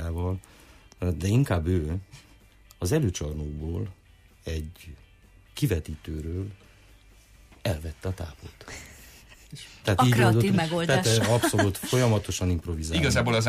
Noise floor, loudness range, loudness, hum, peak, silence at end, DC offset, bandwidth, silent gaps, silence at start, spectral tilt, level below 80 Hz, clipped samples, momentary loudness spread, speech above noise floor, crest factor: -55 dBFS; 13 LU; -26 LUFS; none; -10 dBFS; 0 s; under 0.1%; 15.5 kHz; none; 0 s; -5.5 dB/octave; -42 dBFS; under 0.1%; 20 LU; 29 dB; 16 dB